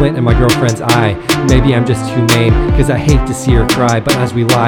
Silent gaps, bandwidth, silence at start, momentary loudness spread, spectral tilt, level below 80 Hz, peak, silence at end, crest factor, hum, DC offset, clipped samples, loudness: none; 19 kHz; 0 s; 3 LU; -5.5 dB/octave; -18 dBFS; 0 dBFS; 0 s; 10 dB; none; under 0.1%; 0.4%; -11 LUFS